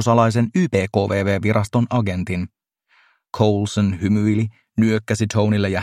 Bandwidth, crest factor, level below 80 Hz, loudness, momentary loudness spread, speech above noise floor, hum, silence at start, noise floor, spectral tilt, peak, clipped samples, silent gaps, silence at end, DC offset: 12 kHz; 18 dB; -52 dBFS; -19 LUFS; 7 LU; 41 dB; none; 0 s; -60 dBFS; -7 dB/octave; -2 dBFS; under 0.1%; none; 0 s; under 0.1%